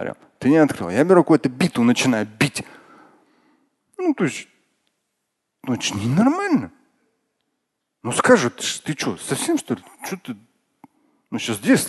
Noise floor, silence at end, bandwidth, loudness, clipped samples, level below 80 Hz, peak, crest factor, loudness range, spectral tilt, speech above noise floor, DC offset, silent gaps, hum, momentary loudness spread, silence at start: -77 dBFS; 0 s; 12.5 kHz; -20 LUFS; under 0.1%; -58 dBFS; 0 dBFS; 22 dB; 8 LU; -5 dB/octave; 57 dB; under 0.1%; none; none; 17 LU; 0 s